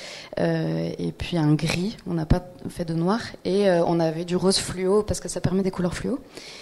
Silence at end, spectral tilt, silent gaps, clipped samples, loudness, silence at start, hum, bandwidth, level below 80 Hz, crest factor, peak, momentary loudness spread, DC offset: 0 s; -5.5 dB/octave; none; under 0.1%; -24 LUFS; 0 s; none; 13 kHz; -40 dBFS; 18 dB; -6 dBFS; 9 LU; under 0.1%